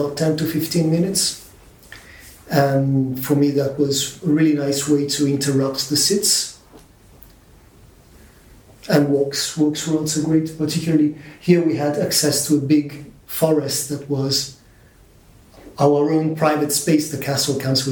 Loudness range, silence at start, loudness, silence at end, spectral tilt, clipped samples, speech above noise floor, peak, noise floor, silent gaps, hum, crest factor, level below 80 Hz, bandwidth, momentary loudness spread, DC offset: 4 LU; 0 s; -19 LUFS; 0 s; -4.5 dB/octave; under 0.1%; 31 dB; -2 dBFS; -49 dBFS; none; none; 18 dB; -54 dBFS; 20 kHz; 6 LU; under 0.1%